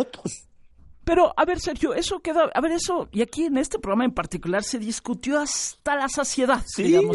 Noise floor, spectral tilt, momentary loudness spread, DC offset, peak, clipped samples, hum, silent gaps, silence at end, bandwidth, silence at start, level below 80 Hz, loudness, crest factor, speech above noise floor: -49 dBFS; -4 dB/octave; 9 LU; under 0.1%; -6 dBFS; under 0.1%; none; none; 0 s; 11.5 kHz; 0 s; -44 dBFS; -24 LUFS; 18 dB; 26 dB